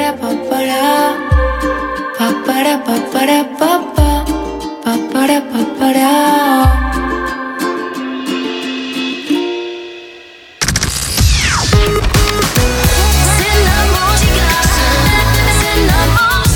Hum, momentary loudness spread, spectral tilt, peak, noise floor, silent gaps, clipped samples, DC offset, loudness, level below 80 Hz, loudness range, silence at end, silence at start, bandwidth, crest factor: none; 9 LU; -4 dB/octave; 0 dBFS; -36 dBFS; none; under 0.1%; under 0.1%; -13 LUFS; -18 dBFS; 7 LU; 0 s; 0 s; 19.5 kHz; 12 dB